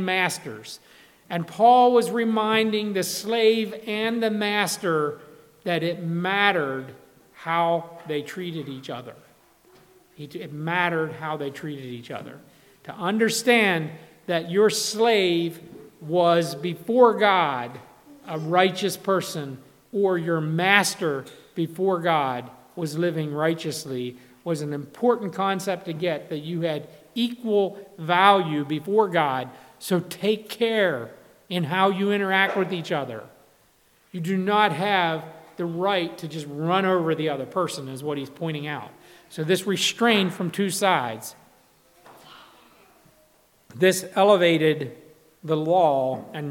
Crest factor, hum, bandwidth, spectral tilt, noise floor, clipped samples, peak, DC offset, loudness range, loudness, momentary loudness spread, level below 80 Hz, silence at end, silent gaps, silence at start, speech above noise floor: 22 dB; none; 18 kHz; -4.5 dB/octave; -61 dBFS; under 0.1%; -2 dBFS; under 0.1%; 7 LU; -23 LUFS; 17 LU; -74 dBFS; 0 s; none; 0 s; 37 dB